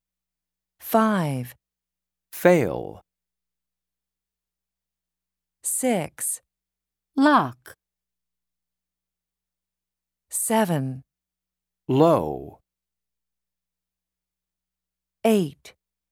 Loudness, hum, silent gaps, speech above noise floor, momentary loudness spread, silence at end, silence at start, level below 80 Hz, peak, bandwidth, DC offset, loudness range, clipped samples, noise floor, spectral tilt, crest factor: -23 LUFS; 60 Hz at -60 dBFS; none; 68 dB; 17 LU; 0.45 s; 0.85 s; -62 dBFS; -4 dBFS; 19.5 kHz; under 0.1%; 6 LU; under 0.1%; -89 dBFS; -5 dB/octave; 24 dB